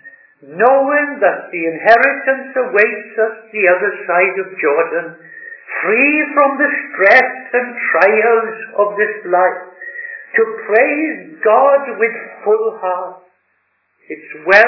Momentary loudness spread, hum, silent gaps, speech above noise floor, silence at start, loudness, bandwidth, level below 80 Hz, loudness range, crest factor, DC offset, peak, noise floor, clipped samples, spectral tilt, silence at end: 16 LU; none; none; 49 dB; 0.05 s; -14 LUFS; 5.4 kHz; -64 dBFS; 4 LU; 14 dB; under 0.1%; 0 dBFS; -63 dBFS; 0.2%; -6 dB/octave; 0 s